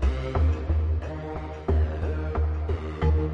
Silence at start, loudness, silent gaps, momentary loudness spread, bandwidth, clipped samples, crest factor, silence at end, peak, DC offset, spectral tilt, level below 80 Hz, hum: 0 s; -28 LUFS; none; 7 LU; 6 kHz; under 0.1%; 14 dB; 0 s; -12 dBFS; under 0.1%; -9 dB/octave; -28 dBFS; none